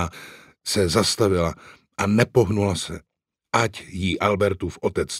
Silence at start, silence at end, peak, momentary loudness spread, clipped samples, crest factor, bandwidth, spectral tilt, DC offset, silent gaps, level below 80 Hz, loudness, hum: 0 s; 0 s; -2 dBFS; 16 LU; under 0.1%; 22 dB; 16 kHz; -5 dB/octave; under 0.1%; none; -46 dBFS; -22 LUFS; none